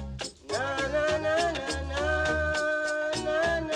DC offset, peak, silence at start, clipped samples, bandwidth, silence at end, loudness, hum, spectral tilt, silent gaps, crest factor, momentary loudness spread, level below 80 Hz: under 0.1%; -16 dBFS; 0 s; under 0.1%; 11.5 kHz; 0 s; -28 LUFS; none; -4 dB/octave; none; 12 dB; 6 LU; -42 dBFS